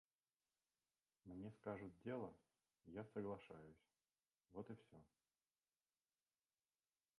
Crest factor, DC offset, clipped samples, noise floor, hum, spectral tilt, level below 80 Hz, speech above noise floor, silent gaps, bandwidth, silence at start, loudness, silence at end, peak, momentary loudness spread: 22 dB; under 0.1%; under 0.1%; under -90 dBFS; none; -8.5 dB/octave; -82 dBFS; over 36 dB; none; 11 kHz; 1.25 s; -55 LUFS; 2.15 s; -38 dBFS; 11 LU